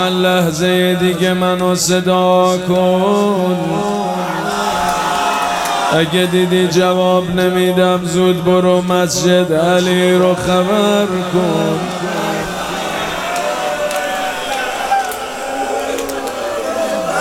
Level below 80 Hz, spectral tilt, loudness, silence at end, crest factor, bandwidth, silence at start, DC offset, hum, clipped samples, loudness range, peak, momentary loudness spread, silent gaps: -46 dBFS; -4.5 dB/octave; -15 LUFS; 0 s; 14 dB; 16.5 kHz; 0 s; under 0.1%; none; under 0.1%; 6 LU; 0 dBFS; 7 LU; none